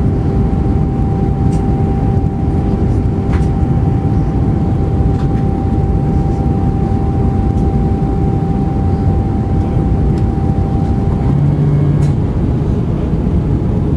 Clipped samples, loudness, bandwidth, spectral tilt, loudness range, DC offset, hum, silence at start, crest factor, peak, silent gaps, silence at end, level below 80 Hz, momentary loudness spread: under 0.1%; -14 LUFS; 9 kHz; -10 dB/octave; 1 LU; under 0.1%; none; 0 s; 10 dB; -2 dBFS; none; 0 s; -18 dBFS; 2 LU